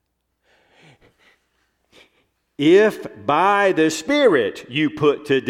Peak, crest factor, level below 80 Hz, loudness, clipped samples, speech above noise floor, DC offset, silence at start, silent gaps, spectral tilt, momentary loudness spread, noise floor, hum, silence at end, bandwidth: -4 dBFS; 16 dB; -62 dBFS; -18 LUFS; under 0.1%; 52 dB; under 0.1%; 2.6 s; none; -5 dB/octave; 8 LU; -69 dBFS; none; 0 s; 14 kHz